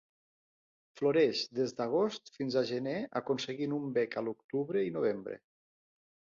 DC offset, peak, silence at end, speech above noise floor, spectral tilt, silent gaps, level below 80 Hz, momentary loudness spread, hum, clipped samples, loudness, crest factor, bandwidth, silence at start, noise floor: under 0.1%; -18 dBFS; 1 s; over 57 dB; -5.5 dB/octave; 4.44-4.49 s; -78 dBFS; 8 LU; none; under 0.1%; -33 LUFS; 18 dB; 7.4 kHz; 0.95 s; under -90 dBFS